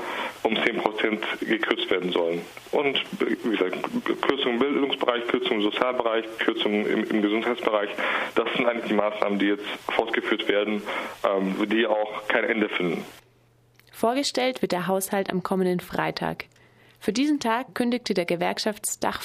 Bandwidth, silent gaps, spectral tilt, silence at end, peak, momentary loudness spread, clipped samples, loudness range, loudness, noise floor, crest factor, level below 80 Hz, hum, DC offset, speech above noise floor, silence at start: 15.5 kHz; none; -4 dB/octave; 0 s; -4 dBFS; 4 LU; under 0.1%; 2 LU; -25 LUFS; -60 dBFS; 22 dB; -64 dBFS; none; under 0.1%; 35 dB; 0 s